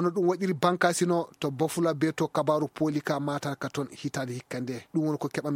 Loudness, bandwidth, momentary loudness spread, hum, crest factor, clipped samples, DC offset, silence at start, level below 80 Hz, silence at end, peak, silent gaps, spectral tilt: -29 LUFS; 16.5 kHz; 9 LU; none; 22 dB; under 0.1%; under 0.1%; 0 s; -70 dBFS; 0 s; -6 dBFS; none; -5.5 dB/octave